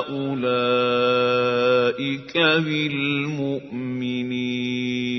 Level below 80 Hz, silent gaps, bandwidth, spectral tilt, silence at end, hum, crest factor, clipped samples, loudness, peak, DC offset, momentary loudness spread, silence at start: -64 dBFS; none; 6.2 kHz; -6 dB/octave; 0 s; none; 16 dB; under 0.1%; -22 LUFS; -6 dBFS; under 0.1%; 8 LU; 0 s